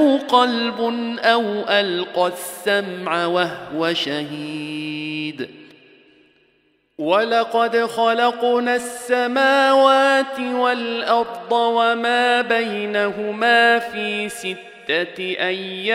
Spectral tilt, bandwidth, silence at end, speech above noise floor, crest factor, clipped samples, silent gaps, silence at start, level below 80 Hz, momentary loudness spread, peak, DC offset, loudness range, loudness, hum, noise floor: -3.5 dB/octave; 16 kHz; 0 s; 43 dB; 18 dB; under 0.1%; none; 0 s; -70 dBFS; 12 LU; -2 dBFS; under 0.1%; 8 LU; -19 LUFS; none; -62 dBFS